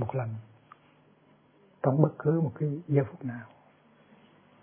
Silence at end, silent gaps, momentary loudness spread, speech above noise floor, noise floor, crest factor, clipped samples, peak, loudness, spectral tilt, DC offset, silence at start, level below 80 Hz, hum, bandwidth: 1.15 s; none; 17 LU; 34 dB; -62 dBFS; 26 dB; under 0.1%; -6 dBFS; -29 LUFS; -13 dB/octave; under 0.1%; 0 s; -72 dBFS; none; 3.4 kHz